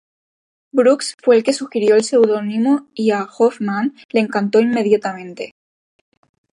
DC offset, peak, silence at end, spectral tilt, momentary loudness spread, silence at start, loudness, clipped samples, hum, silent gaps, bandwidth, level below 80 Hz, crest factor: under 0.1%; -2 dBFS; 1.05 s; -5 dB/octave; 8 LU; 0.75 s; -17 LUFS; under 0.1%; none; 1.14-1.18 s, 4.05-4.09 s; 11 kHz; -70 dBFS; 16 dB